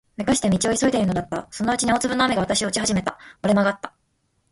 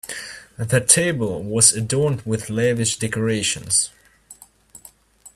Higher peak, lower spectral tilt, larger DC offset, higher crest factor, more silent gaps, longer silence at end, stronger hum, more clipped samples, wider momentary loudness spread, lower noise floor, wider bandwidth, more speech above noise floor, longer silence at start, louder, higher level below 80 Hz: second, -6 dBFS vs 0 dBFS; about the same, -4 dB/octave vs -3 dB/octave; neither; about the same, 18 dB vs 22 dB; neither; first, 0.65 s vs 0.05 s; neither; neither; second, 9 LU vs 14 LU; first, -69 dBFS vs -48 dBFS; second, 11.5 kHz vs 15.5 kHz; first, 47 dB vs 28 dB; first, 0.2 s vs 0.05 s; second, -22 LUFS vs -18 LUFS; about the same, -48 dBFS vs -52 dBFS